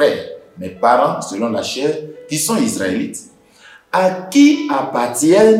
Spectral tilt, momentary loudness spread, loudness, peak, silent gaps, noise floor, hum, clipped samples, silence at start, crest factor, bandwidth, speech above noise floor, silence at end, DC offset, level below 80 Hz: -4 dB/octave; 15 LU; -16 LUFS; 0 dBFS; none; -45 dBFS; none; under 0.1%; 0 s; 14 dB; 16 kHz; 30 dB; 0 s; under 0.1%; -62 dBFS